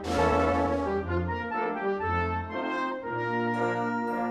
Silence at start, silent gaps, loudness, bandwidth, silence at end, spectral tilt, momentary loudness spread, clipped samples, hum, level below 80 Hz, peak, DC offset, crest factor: 0 s; none; -29 LUFS; 12 kHz; 0 s; -7 dB/octave; 6 LU; under 0.1%; none; -44 dBFS; -12 dBFS; under 0.1%; 16 dB